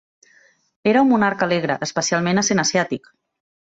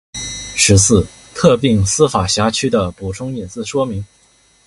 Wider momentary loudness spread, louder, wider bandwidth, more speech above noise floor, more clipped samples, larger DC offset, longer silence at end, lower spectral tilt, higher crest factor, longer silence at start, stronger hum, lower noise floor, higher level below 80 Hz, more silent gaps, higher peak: second, 8 LU vs 14 LU; second, -19 LUFS vs -15 LUFS; second, 8 kHz vs 11.5 kHz; about the same, 37 dB vs 38 dB; neither; neither; first, 0.8 s vs 0.6 s; about the same, -4 dB/octave vs -4 dB/octave; about the same, 16 dB vs 16 dB; first, 0.85 s vs 0.15 s; neither; about the same, -56 dBFS vs -53 dBFS; second, -60 dBFS vs -34 dBFS; neither; second, -4 dBFS vs 0 dBFS